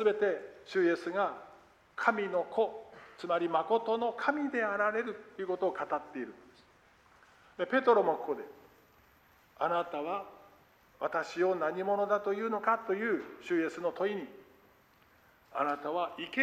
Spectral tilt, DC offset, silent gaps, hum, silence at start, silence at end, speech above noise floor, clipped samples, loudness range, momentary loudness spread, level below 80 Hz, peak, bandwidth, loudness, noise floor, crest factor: -5.5 dB/octave; under 0.1%; none; none; 0 s; 0 s; 32 dB; under 0.1%; 4 LU; 12 LU; -76 dBFS; -12 dBFS; 13 kHz; -33 LUFS; -64 dBFS; 22 dB